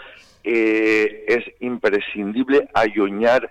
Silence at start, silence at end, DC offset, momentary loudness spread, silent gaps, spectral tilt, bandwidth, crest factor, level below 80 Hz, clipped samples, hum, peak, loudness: 0 s; 0.05 s; under 0.1%; 7 LU; none; -5.5 dB/octave; 9 kHz; 12 dB; -56 dBFS; under 0.1%; none; -8 dBFS; -19 LUFS